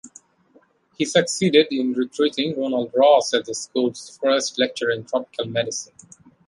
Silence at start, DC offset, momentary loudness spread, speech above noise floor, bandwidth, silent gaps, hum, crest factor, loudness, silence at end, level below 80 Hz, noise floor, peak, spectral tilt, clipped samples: 0.05 s; under 0.1%; 10 LU; 37 dB; 11.5 kHz; none; none; 20 dB; -21 LUFS; 0.65 s; -68 dBFS; -58 dBFS; -2 dBFS; -3.5 dB/octave; under 0.1%